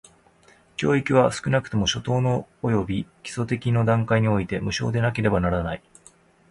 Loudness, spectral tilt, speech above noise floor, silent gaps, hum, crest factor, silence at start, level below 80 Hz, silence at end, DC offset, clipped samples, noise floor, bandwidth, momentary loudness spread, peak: -23 LUFS; -6 dB/octave; 34 dB; none; none; 20 dB; 0.8 s; -44 dBFS; 0.75 s; under 0.1%; under 0.1%; -56 dBFS; 11 kHz; 10 LU; -4 dBFS